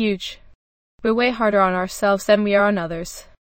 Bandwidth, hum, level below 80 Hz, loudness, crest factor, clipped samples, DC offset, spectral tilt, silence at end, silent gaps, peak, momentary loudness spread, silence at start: 16.5 kHz; none; -48 dBFS; -19 LUFS; 18 dB; under 0.1%; under 0.1%; -5 dB/octave; 0.35 s; 0.55-0.99 s; -4 dBFS; 14 LU; 0 s